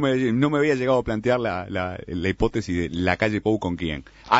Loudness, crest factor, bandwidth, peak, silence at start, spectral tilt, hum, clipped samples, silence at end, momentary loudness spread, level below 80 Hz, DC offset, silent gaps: -23 LUFS; 22 dB; 8 kHz; 0 dBFS; 0 s; -6.5 dB/octave; none; under 0.1%; 0 s; 8 LU; -42 dBFS; under 0.1%; none